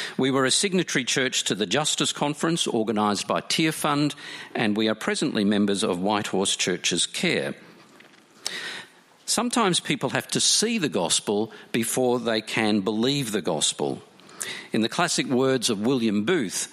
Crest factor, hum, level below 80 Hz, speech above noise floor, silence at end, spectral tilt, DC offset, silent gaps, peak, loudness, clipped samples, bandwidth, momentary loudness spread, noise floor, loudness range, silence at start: 18 dB; none; -68 dBFS; 28 dB; 0 s; -3 dB/octave; under 0.1%; none; -6 dBFS; -24 LUFS; under 0.1%; 15.5 kHz; 9 LU; -52 dBFS; 3 LU; 0 s